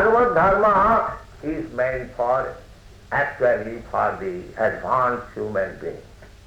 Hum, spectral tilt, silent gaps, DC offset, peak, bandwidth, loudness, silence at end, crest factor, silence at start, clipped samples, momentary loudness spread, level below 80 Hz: none; -7 dB/octave; none; under 0.1%; -8 dBFS; over 20 kHz; -22 LUFS; 0.2 s; 14 dB; 0 s; under 0.1%; 14 LU; -44 dBFS